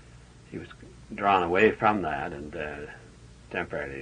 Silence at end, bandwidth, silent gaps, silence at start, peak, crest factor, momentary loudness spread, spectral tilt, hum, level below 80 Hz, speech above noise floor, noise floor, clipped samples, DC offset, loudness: 0 s; 10 kHz; none; 0.15 s; -8 dBFS; 20 dB; 21 LU; -6.5 dB/octave; none; -54 dBFS; 23 dB; -51 dBFS; under 0.1%; under 0.1%; -27 LUFS